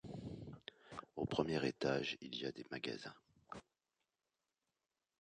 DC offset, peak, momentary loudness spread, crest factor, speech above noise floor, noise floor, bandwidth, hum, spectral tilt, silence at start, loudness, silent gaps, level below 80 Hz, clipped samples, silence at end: under 0.1%; -20 dBFS; 17 LU; 26 dB; over 48 dB; under -90 dBFS; 10 kHz; none; -5.5 dB/octave; 0.05 s; -43 LUFS; none; -70 dBFS; under 0.1%; 1.6 s